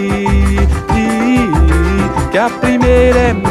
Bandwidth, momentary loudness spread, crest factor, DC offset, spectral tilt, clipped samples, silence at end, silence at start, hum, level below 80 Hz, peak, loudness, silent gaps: 12.5 kHz; 5 LU; 10 dB; under 0.1%; -7 dB/octave; under 0.1%; 0 s; 0 s; none; -16 dBFS; 0 dBFS; -12 LUFS; none